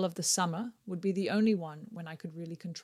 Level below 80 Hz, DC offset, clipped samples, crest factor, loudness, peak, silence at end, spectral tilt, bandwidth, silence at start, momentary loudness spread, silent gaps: -78 dBFS; under 0.1%; under 0.1%; 18 dB; -32 LUFS; -14 dBFS; 0 s; -4 dB/octave; 15 kHz; 0 s; 14 LU; none